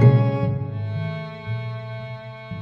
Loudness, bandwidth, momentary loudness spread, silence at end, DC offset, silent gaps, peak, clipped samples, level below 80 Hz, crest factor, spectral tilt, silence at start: -25 LUFS; 5.2 kHz; 15 LU; 0 s; under 0.1%; none; -4 dBFS; under 0.1%; -52 dBFS; 18 dB; -10 dB/octave; 0 s